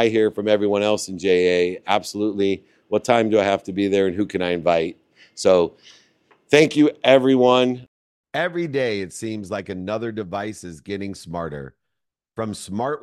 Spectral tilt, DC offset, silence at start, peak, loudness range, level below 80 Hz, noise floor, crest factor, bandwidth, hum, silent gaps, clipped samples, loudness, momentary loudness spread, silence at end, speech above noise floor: -5 dB/octave; under 0.1%; 0 s; 0 dBFS; 11 LU; -60 dBFS; -81 dBFS; 20 dB; 13 kHz; none; 7.88-8.24 s; under 0.1%; -21 LUFS; 14 LU; 0.05 s; 61 dB